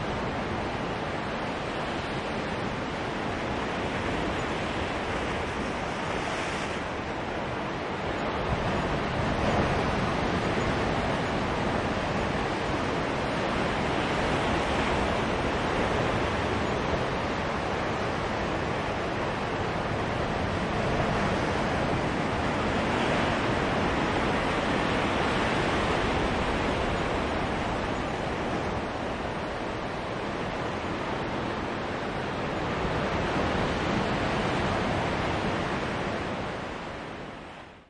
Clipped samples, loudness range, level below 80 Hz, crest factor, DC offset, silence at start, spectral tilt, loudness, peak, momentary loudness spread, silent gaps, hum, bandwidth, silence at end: under 0.1%; 4 LU; -42 dBFS; 16 dB; under 0.1%; 0 s; -5.5 dB/octave; -29 LUFS; -14 dBFS; 5 LU; none; none; 11.5 kHz; 0.05 s